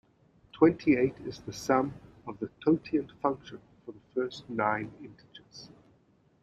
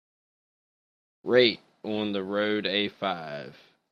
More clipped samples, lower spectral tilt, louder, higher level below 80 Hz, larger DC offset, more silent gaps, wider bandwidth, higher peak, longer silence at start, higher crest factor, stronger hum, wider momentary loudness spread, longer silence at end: neither; about the same, -6.5 dB/octave vs -6.5 dB/octave; second, -30 LUFS vs -26 LUFS; first, -64 dBFS vs -72 dBFS; neither; neither; first, 13.5 kHz vs 6.6 kHz; second, -10 dBFS vs -6 dBFS; second, 0.55 s vs 1.25 s; about the same, 22 dB vs 22 dB; neither; first, 24 LU vs 18 LU; first, 0.75 s vs 0.4 s